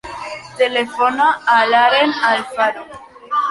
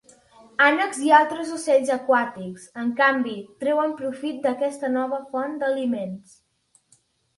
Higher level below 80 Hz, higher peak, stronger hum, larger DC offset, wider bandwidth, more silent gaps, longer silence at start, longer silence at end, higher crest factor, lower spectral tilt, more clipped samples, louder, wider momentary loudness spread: first, -56 dBFS vs -72 dBFS; about the same, -2 dBFS vs -4 dBFS; neither; neither; about the same, 11.5 kHz vs 11.5 kHz; neither; second, 0.05 s vs 0.6 s; second, 0 s vs 1.2 s; second, 14 dB vs 20 dB; about the same, -3 dB/octave vs -4 dB/octave; neither; first, -15 LUFS vs -22 LUFS; first, 17 LU vs 13 LU